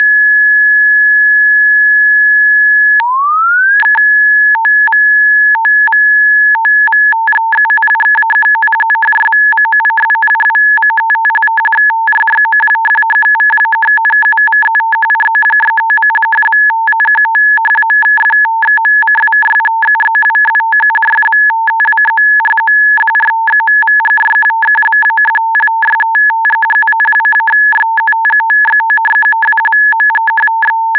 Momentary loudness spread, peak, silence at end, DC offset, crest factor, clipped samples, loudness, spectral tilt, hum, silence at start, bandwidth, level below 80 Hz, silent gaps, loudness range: 3 LU; 0 dBFS; 0 s; under 0.1%; 8 dB; under 0.1%; -7 LUFS; -2.5 dB/octave; none; 0 s; 4 kHz; -66 dBFS; none; 2 LU